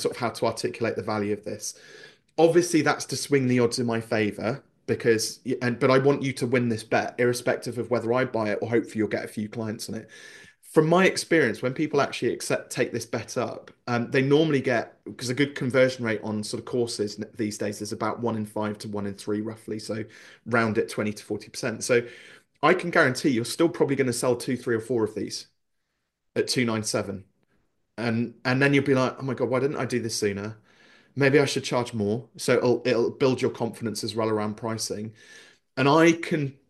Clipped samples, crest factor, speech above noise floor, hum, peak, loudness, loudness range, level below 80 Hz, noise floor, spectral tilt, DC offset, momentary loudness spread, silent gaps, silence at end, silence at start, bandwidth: under 0.1%; 20 dB; 53 dB; none; -6 dBFS; -25 LUFS; 5 LU; -68 dBFS; -78 dBFS; -5 dB/octave; under 0.1%; 12 LU; none; 0.15 s; 0 s; 12.5 kHz